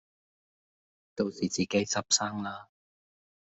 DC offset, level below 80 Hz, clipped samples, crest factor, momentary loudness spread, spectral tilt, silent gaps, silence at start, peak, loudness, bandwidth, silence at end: under 0.1%; -70 dBFS; under 0.1%; 26 dB; 15 LU; -3 dB/octave; none; 1.15 s; -8 dBFS; -30 LUFS; 8.2 kHz; 0.95 s